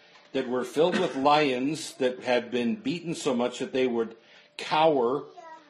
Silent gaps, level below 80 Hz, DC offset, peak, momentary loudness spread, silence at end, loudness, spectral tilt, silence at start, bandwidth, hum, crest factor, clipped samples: none; -74 dBFS; under 0.1%; -8 dBFS; 11 LU; 0.1 s; -27 LUFS; -4.5 dB/octave; 0.35 s; 13 kHz; none; 18 dB; under 0.1%